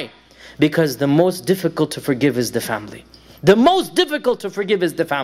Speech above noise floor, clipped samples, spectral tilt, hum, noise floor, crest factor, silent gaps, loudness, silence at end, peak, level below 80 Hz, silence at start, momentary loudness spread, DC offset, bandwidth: 19 dB; under 0.1%; -5.5 dB/octave; none; -37 dBFS; 16 dB; none; -18 LUFS; 0 s; -2 dBFS; -54 dBFS; 0 s; 10 LU; under 0.1%; 16 kHz